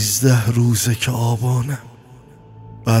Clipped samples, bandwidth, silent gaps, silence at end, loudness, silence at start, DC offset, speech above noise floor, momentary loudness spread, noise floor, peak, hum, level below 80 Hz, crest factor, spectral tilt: under 0.1%; 16.5 kHz; none; 0 s; -18 LUFS; 0 s; under 0.1%; 27 dB; 11 LU; -43 dBFS; -2 dBFS; none; -48 dBFS; 16 dB; -5 dB/octave